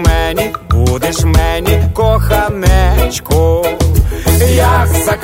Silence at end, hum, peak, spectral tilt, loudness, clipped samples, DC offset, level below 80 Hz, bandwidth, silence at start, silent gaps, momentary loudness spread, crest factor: 0 s; none; 0 dBFS; -5.5 dB/octave; -12 LUFS; under 0.1%; under 0.1%; -14 dBFS; 16.5 kHz; 0 s; none; 4 LU; 10 dB